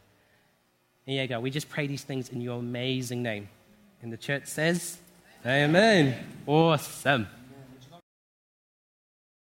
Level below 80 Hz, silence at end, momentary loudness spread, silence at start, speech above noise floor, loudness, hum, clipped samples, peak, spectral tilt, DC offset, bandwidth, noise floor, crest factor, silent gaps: -68 dBFS; 1.5 s; 17 LU; 1.05 s; 42 dB; -27 LUFS; none; under 0.1%; -8 dBFS; -5 dB/octave; under 0.1%; 16.5 kHz; -69 dBFS; 22 dB; none